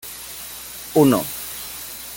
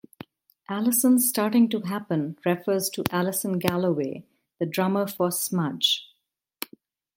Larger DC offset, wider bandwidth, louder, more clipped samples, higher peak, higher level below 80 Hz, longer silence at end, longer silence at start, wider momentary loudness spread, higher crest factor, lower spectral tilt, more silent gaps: neither; about the same, 17 kHz vs 17 kHz; about the same, -22 LUFS vs -24 LUFS; neither; second, -4 dBFS vs 0 dBFS; first, -52 dBFS vs -66 dBFS; second, 0 s vs 1.1 s; second, 0.05 s vs 0.7 s; first, 16 LU vs 13 LU; about the same, 20 dB vs 24 dB; about the same, -5 dB/octave vs -4 dB/octave; neither